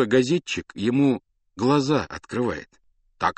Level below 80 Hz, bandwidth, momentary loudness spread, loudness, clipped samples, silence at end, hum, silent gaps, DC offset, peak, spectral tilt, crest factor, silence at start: -56 dBFS; 8.8 kHz; 10 LU; -24 LUFS; under 0.1%; 0.05 s; none; none; under 0.1%; -6 dBFS; -6 dB/octave; 18 dB; 0 s